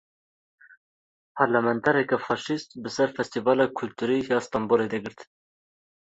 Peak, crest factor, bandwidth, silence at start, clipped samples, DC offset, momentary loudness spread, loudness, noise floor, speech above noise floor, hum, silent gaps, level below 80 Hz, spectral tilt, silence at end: -6 dBFS; 22 dB; 8 kHz; 1.35 s; under 0.1%; under 0.1%; 9 LU; -25 LUFS; under -90 dBFS; over 65 dB; none; none; -66 dBFS; -5.5 dB/octave; 0.8 s